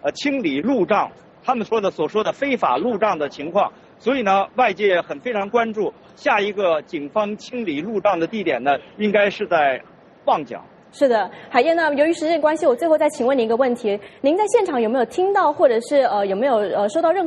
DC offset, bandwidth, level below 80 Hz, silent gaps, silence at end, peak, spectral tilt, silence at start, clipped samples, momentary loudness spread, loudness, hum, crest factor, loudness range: under 0.1%; 11.5 kHz; -64 dBFS; none; 0 s; -2 dBFS; -5 dB/octave; 0.05 s; under 0.1%; 8 LU; -20 LUFS; none; 18 dB; 3 LU